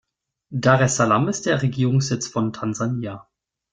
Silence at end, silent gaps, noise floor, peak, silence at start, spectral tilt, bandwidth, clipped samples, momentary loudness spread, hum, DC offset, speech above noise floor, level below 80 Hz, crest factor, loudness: 0.5 s; none; -53 dBFS; -2 dBFS; 0.5 s; -5.5 dB/octave; 9.6 kHz; under 0.1%; 12 LU; none; under 0.1%; 32 dB; -56 dBFS; 20 dB; -21 LUFS